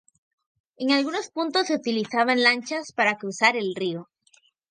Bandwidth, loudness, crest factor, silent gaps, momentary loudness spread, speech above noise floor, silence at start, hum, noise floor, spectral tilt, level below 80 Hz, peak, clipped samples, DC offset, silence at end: 9.8 kHz; -23 LUFS; 22 dB; none; 11 LU; 38 dB; 0.8 s; none; -62 dBFS; -3.5 dB/octave; -78 dBFS; -4 dBFS; under 0.1%; under 0.1%; 0.65 s